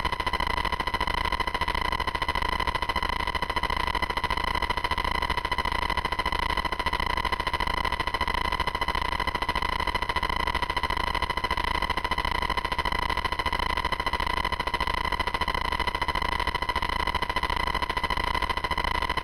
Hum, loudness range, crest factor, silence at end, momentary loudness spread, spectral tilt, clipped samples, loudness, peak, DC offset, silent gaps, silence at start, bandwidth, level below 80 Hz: none; 0 LU; 18 dB; 0 s; 1 LU; -4 dB/octave; under 0.1%; -27 LUFS; -10 dBFS; under 0.1%; none; 0 s; 17 kHz; -36 dBFS